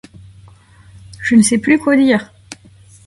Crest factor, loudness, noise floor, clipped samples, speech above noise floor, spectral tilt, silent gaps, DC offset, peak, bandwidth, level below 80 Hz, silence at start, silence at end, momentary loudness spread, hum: 16 dB; -13 LUFS; -44 dBFS; under 0.1%; 32 dB; -4.5 dB/octave; none; under 0.1%; 0 dBFS; 11.5 kHz; -50 dBFS; 1.2 s; 0.5 s; 19 LU; none